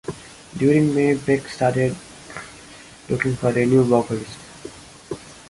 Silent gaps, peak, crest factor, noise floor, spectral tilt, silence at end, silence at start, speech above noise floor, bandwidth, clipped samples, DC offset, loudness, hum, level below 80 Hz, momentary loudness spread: none; -4 dBFS; 18 dB; -43 dBFS; -7 dB/octave; 0.15 s; 0.05 s; 24 dB; 11.5 kHz; under 0.1%; under 0.1%; -20 LUFS; none; -52 dBFS; 22 LU